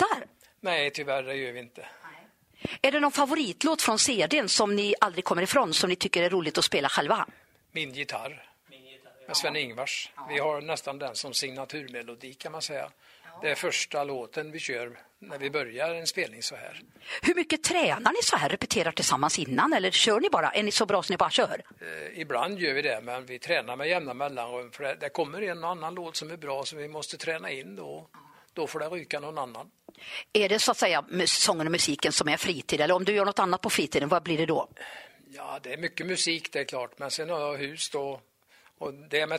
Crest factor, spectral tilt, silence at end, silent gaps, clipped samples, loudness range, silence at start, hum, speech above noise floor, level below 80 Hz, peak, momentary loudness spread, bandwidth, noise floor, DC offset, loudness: 24 dB; -2.5 dB/octave; 0 s; none; under 0.1%; 9 LU; 0 s; none; 32 dB; -68 dBFS; -6 dBFS; 15 LU; 16 kHz; -61 dBFS; under 0.1%; -27 LUFS